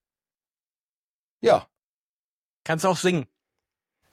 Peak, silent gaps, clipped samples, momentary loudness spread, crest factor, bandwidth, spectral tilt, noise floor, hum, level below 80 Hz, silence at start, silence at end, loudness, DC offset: -6 dBFS; 1.83-2.65 s; under 0.1%; 13 LU; 22 dB; 15.5 kHz; -5 dB/octave; under -90 dBFS; none; -70 dBFS; 1.45 s; 0.85 s; -23 LUFS; under 0.1%